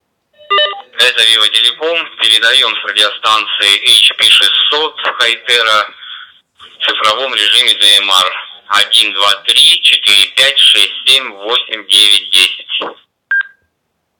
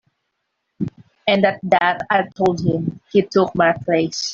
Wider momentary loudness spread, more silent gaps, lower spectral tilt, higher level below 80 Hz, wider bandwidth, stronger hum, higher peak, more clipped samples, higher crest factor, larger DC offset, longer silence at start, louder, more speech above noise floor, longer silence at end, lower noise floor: about the same, 10 LU vs 11 LU; neither; second, 1.5 dB/octave vs -5.5 dB/octave; second, -70 dBFS vs -56 dBFS; first, over 20 kHz vs 7.8 kHz; neither; about the same, 0 dBFS vs -2 dBFS; neither; about the same, 12 dB vs 16 dB; neither; second, 0.5 s vs 0.8 s; first, -8 LUFS vs -19 LUFS; about the same, 57 dB vs 57 dB; first, 0.7 s vs 0 s; second, -67 dBFS vs -74 dBFS